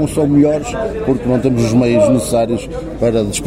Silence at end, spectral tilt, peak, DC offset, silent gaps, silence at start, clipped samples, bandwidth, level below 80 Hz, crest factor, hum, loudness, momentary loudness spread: 0 s; -6.5 dB/octave; -2 dBFS; under 0.1%; none; 0 s; under 0.1%; 16 kHz; -34 dBFS; 12 dB; none; -14 LUFS; 7 LU